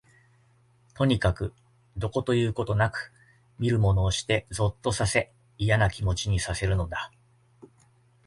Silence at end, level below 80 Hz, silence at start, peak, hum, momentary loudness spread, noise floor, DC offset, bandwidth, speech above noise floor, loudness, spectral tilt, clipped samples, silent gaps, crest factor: 1.2 s; -40 dBFS; 0.95 s; -8 dBFS; none; 12 LU; -62 dBFS; under 0.1%; 11.5 kHz; 36 dB; -27 LUFS; -5.5 dB/octave; under 0.1%; none; 20 dB